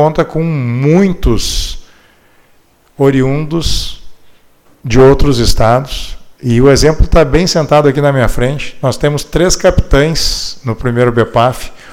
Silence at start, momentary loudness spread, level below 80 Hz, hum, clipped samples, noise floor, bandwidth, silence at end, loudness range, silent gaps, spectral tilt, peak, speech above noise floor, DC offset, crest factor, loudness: 0 s; 11 LU; -20 dBFS; none; 0.2%; -48 dBFS; 16.5 kHz; 0 s; 6 LU; none; -5.5 dB/octave; 0 dBFS; 38 dB; under 0.1%; 10 dB; -11 LUFS